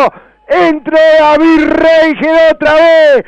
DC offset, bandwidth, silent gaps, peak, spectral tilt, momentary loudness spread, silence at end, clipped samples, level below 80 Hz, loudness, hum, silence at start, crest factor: under 0.1%; 8.2 kHz; none; -2 dBFS; -5 dB/octave; 5 LU; 0.05 s; under 0.1%; -38 dBFS; -7 LUFS; none; 0 s; 6 dB